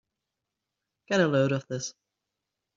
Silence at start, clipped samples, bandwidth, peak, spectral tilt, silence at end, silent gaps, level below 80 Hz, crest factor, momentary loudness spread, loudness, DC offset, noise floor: 1.1 s; under 0.1%; 7.8 kHz; -10 dBFS; -5 dB/octave; 0.85 s; none; -70 dBFS; 20 dB; 11 LU; -27 LUFS; under 0.1%; -86 dBFS